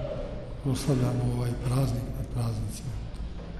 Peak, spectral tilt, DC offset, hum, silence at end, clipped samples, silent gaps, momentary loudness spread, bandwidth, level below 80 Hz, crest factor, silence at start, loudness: -14 dBFS; -7 dB/octave; under 0.1%; none; 0 s; under 0.1%; none; 11 LU; 13.5 kHz; -38 dBFS; 16 dB; 0 s; -31 LUFS